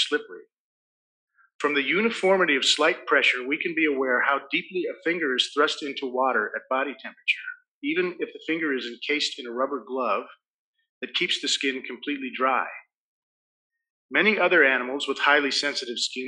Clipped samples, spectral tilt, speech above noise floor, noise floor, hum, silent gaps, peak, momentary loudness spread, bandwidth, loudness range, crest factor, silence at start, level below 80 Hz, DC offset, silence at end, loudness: under 0.1%; -2.5 dB/octave; over 65 dB; under -90 dBFS; none; 0.59-1.28 s, 1.55-1.59 s, 7.68-7.82 s, 10.50-10.73 s, 10.89-11.01 s, 12.97-13.70 s, 13.90-14.09 s; -6 dBFS; 10 LU; 11 kHz; 6 LU; 20 dB; 0 s; -78 dBFS; under 0.1%; 0 s; -24 LUFS